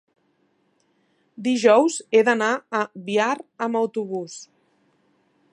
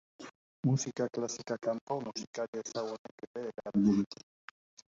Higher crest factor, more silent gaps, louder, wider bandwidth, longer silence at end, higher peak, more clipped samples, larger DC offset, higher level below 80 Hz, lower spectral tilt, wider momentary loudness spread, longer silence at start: about the same, 20 dB vs 18 dB; second, none vs 0.35-0.63 s, 1.81-1.87 s, 2.27-2.33 s, 2.48-2.53 s, 2.99-3.05 s, 3.11-3.18 s, 3.27-3.34 s, 4.06-4.11 s; first, -21 LUFS vs -35 LUFS; first, 10.5 kHz vs 7.8 kHz; first, 1.1 s vs 0.8 s; first, -4 dBFS vs -16 dBFS; neither; neither; second, -80 dBFS vs -70 dBFS; second, -4 dB/octave vs -6 dB/octave; second, 13 LU vs 22 LU; first, 1.4 s vs 0.2 s